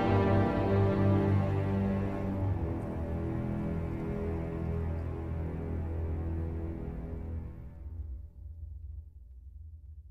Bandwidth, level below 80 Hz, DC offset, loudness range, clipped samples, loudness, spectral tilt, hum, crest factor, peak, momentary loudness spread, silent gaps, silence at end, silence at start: 5.2 kHz; -44 dBFS; under 0.1%; 12 LU; under 0.1%; -33 LUFS; -10 dB/octave; none; 16 dB; -16 dBFS; 20 LU; none; 0 s; 0 s